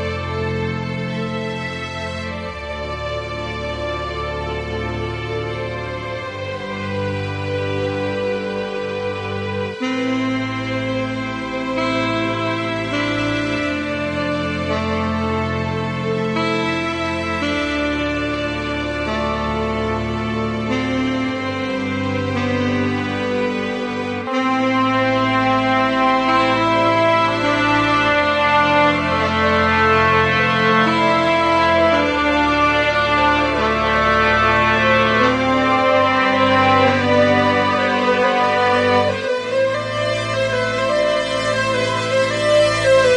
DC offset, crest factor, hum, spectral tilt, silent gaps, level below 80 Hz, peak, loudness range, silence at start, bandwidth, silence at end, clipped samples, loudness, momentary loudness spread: under 0.1%; 16 dB; none; -5.5 dB/octave; none; -40 dBFS; -2 dBFS; 10 LU; 0 s; 11.5 kHz; 0 s; under 0.1%; -18 LUFS; 10 LU